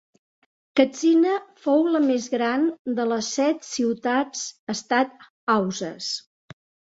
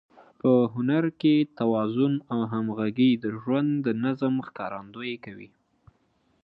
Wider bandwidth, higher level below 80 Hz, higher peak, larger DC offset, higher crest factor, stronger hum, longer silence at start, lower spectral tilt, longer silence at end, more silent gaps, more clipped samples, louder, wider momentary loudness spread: first, 8 kHz vs 5.2 kHz; about the same, -70 dBFS vs -68 dBFS; first, -4 dBFS vs -10 dBFS; neither; about the same, 20 dB vs 16 dB; neither; first, 0.75 s vs 0.45 s; second, -4 dB/octave vs -10 dB/octave; second, 0.75 s vs 1 s; first, 2.79-2.85 s, 4.59-4.67 s, 5.30-5.47 s vs none; neither; first, -23 LUFS vs -26 LUFS; about the same, 10 LU vs 12 LU